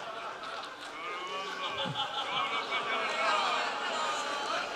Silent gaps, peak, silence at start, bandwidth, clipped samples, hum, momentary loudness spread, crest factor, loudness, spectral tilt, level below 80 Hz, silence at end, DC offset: none; -16 dBFS; 0 s; 15 kHz; under 0.1%; none; 11 LU; 18 dB; -33 LUFS; -2 dB/octave; -76 dBFS; 0 s; under 0.1%